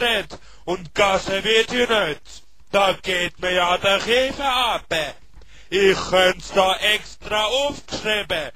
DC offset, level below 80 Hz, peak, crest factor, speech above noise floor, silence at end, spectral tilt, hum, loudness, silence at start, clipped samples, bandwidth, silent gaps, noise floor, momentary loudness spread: 0.8%; -44 dBFS; -2 dBFS; 18 dB; 26 dB; 0.05 s; -2.5 dB/octave; none; -20 LUFS; 0 s; under 0.1%; 14 kHz; none; -47 dBFS; 8 LU